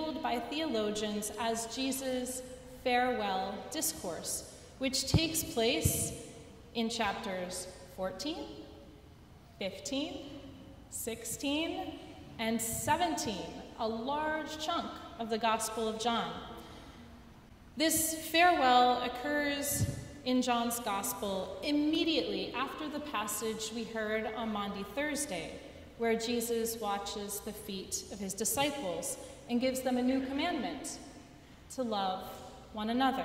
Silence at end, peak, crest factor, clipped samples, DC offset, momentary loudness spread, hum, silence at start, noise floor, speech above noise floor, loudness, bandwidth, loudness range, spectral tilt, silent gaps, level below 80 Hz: 0 s; -12 dBFS; 22 dB; under 0.1%; under 0.1%; 16 LU; none; 0 s; -55 dBFS; 22 dB; -34 LUFS; 16 kHz; 9 LU; -3.5 dB/octave; none; -56 dBFS